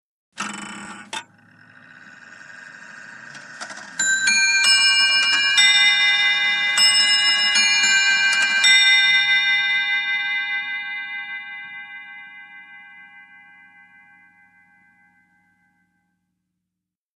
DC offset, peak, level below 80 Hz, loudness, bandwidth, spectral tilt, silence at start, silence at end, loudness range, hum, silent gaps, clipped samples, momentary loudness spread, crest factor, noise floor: under 0.1%; -4 dBFS; -78 dBFS; -15 LUFS; 14 kHz; 2.5 dB/octave; 0.35 s; 4.15 s; 21 LU; none; none; under 0.1%; 22 LU; 18 dB; -84 dBFS